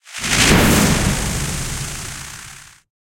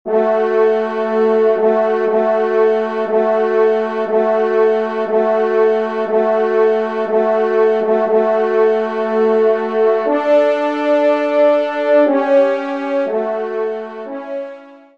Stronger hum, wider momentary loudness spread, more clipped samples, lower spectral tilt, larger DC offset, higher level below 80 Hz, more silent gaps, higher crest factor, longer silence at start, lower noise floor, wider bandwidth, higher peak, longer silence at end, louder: neither; first, 19 LU vs 6 LU; neither; second, -3.5 dB/octave vs -6.5 dB/octave; second, under 0.1% vs 0.4%; first, -28 dBFS vs -70 dBFS; neither; first, 18 dB vs 12 dB; about the same, 0.05 s vs 0.05 s; about the same, -39 dBFS vs -36 dBFS; first, 16.5 kHz vs 6.4 kHz; first, 0 dBFS vs -4 dBFS; first, 0.4 s vs 0.2 s; about the same, -16 LUFS vs -15 LUFS